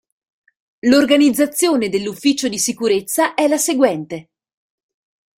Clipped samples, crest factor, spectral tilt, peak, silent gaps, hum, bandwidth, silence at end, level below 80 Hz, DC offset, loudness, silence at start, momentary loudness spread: under 0.1%; 16 dB; -3 dB/octave; -2 dBFS; none; none; 16.5 kHz; 1.2 s; -60 dBFS; under 0.1%; -16 LUFS; 0.85 s; 8 LU